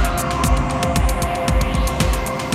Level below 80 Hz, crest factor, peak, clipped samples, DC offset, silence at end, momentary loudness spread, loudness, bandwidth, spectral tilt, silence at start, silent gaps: -22 dBFS; 14 dB; -4 dBFS; under 0.1%; under 0.1%; 0 s; 2 LU; -19 LUFS; 15.5 kHz; -5 dB/octave; 0 s; none